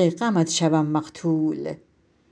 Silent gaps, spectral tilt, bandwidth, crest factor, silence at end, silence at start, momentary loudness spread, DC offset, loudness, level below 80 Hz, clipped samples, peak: none; -5.5 dB/octave; 10 kHz; 16 dB; 0.55 s; 0 s; 12 LU; under 0.1%; -23 LUFS; -66 dBFS; under 0.1%; -8 dBFS